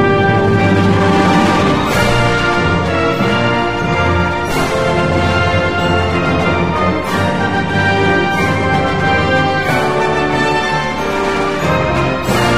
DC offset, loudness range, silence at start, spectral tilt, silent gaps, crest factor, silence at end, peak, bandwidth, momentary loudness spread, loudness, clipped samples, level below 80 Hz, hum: 2%; 2 LU; 0 s; -6 dB/octave; none; 12 dB; 0 s; -2 dBFS; 15.5 kHz; 4 LU; -13 LUFS; under 0.1%; -32 dBFS; none